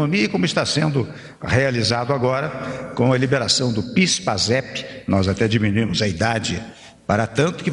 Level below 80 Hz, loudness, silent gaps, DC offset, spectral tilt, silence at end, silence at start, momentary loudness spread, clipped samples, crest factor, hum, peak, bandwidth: -48 dBFS; -20 LUFS; none; under 0.1%; -4.5 dB/octave; 0 s; 0 s; 11 LU; under 0.1%; 16 dB; none; -4 dBFS; 11 kHz